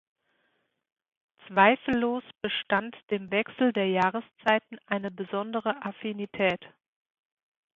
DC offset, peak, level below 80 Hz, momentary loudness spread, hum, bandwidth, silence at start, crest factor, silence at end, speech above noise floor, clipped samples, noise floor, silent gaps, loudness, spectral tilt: under 0.1%; -4 dBFS; -68 dBFS; 12 LU; none; 7.4 kHz; 1.5 s; 24 dB; 1.05 s; 47 dB; under 0.1%; -75 dBFS; none; -28 LUFS; -7 dB/octave